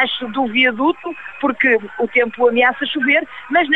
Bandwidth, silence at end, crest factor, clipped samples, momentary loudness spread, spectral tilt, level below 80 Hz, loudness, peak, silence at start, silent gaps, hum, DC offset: 4.2 kHz; 0 s; 14 dB; under 0.1%; 7 LU; -5.5 dB/octave; -58 dBFS; -16 LUFS; -2 dBFS; 0 s; none; none; 0.5%